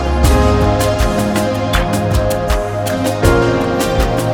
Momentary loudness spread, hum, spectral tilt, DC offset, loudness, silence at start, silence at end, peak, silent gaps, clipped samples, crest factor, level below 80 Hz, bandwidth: 5 LU; none; -5.5 dB/octave; under 0.1%; -14 LUFS; 0 s; 0 s; 0 dBFS; none; under 0.1%; 14 dB; -20 dBFS; 19 kHz